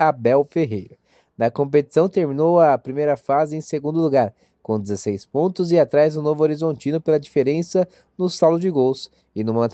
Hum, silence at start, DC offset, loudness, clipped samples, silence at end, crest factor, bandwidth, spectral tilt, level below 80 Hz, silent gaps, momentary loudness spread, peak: none; 0 s; under 0.1%; -20 LUFS; under 0.1%; 0.05 s; 16 dB; 8.6 kHz; -7 dB/octave; -64 dBFS; none; 9 LU; -4 dBFS